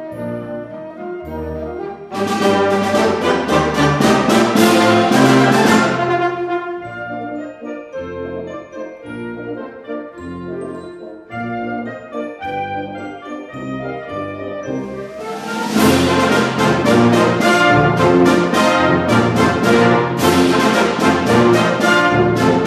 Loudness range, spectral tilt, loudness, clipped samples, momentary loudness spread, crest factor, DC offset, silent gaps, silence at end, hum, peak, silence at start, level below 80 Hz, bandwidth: 15 LU; -5.5 dB/octave; -14 LUFS; under 0.1%; 17 LU; 14 dB; under 0.1%; none; 0 s; none; 0 dBFS; 0 s; -44 dBFS; 14 kHz